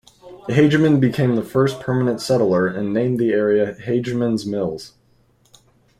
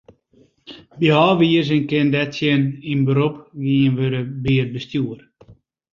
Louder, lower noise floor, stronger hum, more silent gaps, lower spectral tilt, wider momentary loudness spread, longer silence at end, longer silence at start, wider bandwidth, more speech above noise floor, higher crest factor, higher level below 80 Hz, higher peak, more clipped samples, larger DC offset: about the same, -19 LUFS vs -19 LUFS; about the same, -58 dBFS vs -56 dBFS; neither; neither; about the same, -7 dB/octave vs -8 dB/octave; about the same, 8 LU vs 10 LU; first, 1.1 s vs 0.4 s; second, 0.25 s vs 0.7 s; first, 14.5 kHz vs 7.2 kHz; about the same, 40 dB vs 38 dB; about the same, 18 dB vs 18 dB; about the same, -54 dBFS vs -52 dBFS; about the same, -2 dBFS vs -2 dBFS; neither; neither